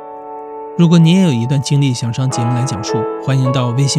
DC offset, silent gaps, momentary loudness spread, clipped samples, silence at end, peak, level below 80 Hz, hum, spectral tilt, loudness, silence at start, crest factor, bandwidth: under 0.1%; none; 17 LU; under 0.1%; 0 s; 0 dBFS; -54 dBFS; none; -6 dB/octave; -14 LUFS; 0 s; 14 dB; 11 kHz